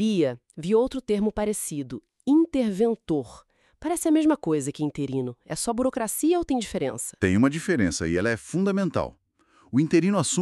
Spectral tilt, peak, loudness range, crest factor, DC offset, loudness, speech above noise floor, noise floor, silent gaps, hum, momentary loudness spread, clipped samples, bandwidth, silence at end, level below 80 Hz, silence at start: -5.5 dB/octave; -6 dBFS; 2 LU; 20 dB; under 0.1%; -25 LUFS; 36 dB; -61 dBFS; none; none; 9 LU; under 0.1%; 13.5 kHz; 0 s; -52 dBFS; 0 s